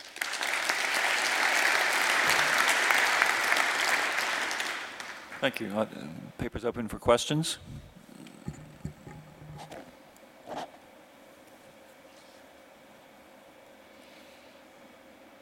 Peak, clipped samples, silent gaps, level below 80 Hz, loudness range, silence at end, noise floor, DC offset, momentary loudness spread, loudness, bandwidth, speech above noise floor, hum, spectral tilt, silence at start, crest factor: -6 dBFS; under 0.1%; none; -60 dBFS; 23 LU; 0.2 s; -54 dBFS; under 0.1%; 23 LU; -27 LUFS; 16.5 kHz; 23 dB; none; -2 dB/octave; 0 s; 26 dB